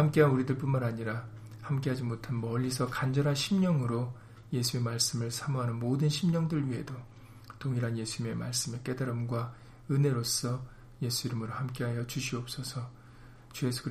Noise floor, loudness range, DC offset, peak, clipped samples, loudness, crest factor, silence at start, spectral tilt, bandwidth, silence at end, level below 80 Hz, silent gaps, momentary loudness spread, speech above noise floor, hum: -52 dBFS; 4 LU; under 0.1%; -12 dBFS; under 0.1%; -32 LUFS; 20 dB; 0 s; -5.5 dB/octave; 15.5 kHz; 0 s; -58 dBFS; none; 12 LU; 21 dB; none